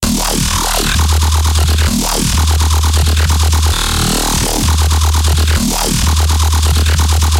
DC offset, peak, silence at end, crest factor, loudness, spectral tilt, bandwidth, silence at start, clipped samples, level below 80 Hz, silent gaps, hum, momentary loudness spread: under 0.1%; -2 dBFS; 0 s; 10 dB; -12 LUFS; -3.5 dB/octave; 16.5 kHz; 0 s; under 0.1%; -14 dBFS; none; none; 1 LU